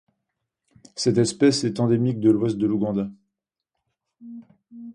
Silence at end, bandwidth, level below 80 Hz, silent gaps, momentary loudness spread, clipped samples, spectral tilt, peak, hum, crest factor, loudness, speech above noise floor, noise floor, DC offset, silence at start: 0 s; 11 kHz; -60 dBFS; none; 23 LU; under 0.1%; -6 dB/octave; -6 dBFS; none; 18 dB; -22 LUFS; 62 dB; -83 dBFS; under 0.1%; 0.95 s